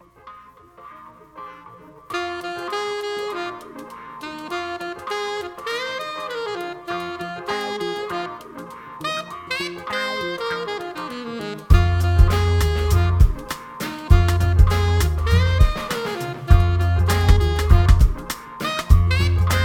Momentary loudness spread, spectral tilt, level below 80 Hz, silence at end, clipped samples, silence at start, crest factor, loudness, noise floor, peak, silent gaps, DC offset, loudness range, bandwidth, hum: 15 LU; -6 dB/octave; -24 dBFS; 0 s; under 0.1%; 0.25 s; 18 dB; -21 LUFS; -46 dBFS; 0 dBFS; none; under 0.1%; 10 LU; 16.5 kHz; none